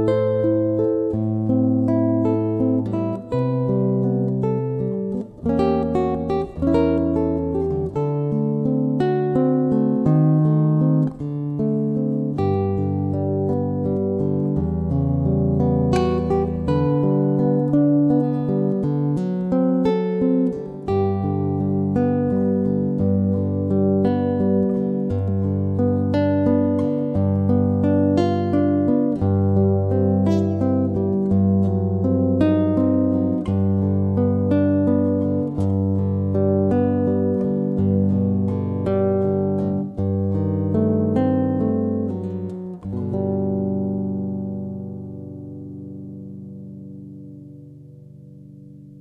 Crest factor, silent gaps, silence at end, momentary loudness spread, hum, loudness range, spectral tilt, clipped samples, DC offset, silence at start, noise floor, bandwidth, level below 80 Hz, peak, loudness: 16 dB; none; 0 s; 8 LU; none; 5 LU; -10.5 dB/octave; under 0.1%; under 0.1%; 0 s; -42 dBFS; 6 kHz; -44 dBFS; -4 dBFS; -20 LUFS